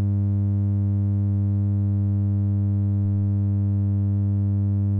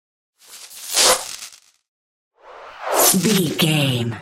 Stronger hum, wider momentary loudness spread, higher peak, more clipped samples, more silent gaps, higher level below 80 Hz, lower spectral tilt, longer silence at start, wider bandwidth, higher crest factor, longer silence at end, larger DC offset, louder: first, 50 Hz at -20 dBFS vs none; second, 0 LU vs 19 LU; second, -16 dBFS vs 0 dBFS; neither; second, none vs 1.88-2.31 s; first, -52 dBFS vs -58 dBFS; first, -14 dB/octave vs -3 dB/octave; second, 0 s vs 0.5 s; second, 1.5 kHz vs 16.5 kHz; second, 6 dB vs 20 dB; about the same, 0 s vs 0 s; neither; second, -23 LUFS vs -16 LUFS